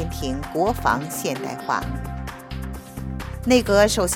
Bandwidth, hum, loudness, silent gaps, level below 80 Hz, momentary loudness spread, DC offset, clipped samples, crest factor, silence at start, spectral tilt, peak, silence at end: 18 kHz; none; -23 LUFS; none; -36 dBFS; 16 LU; under 0.1%; under 0.1%; 20 dB; 0 s; -4.5 dB/octave; -4 dBFS; 0 s